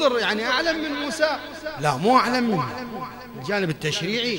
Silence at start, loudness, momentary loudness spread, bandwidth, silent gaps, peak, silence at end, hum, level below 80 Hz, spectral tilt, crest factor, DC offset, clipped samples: 0 s; -23 LUFS; 14 LU; 16.5 kHz; none; -2 dBFS; 0 s; 50 Hz at -50 dBFS; -56 dBFS; -4.5 dB/octave; 20 dB; under 0.1%; under 0.1%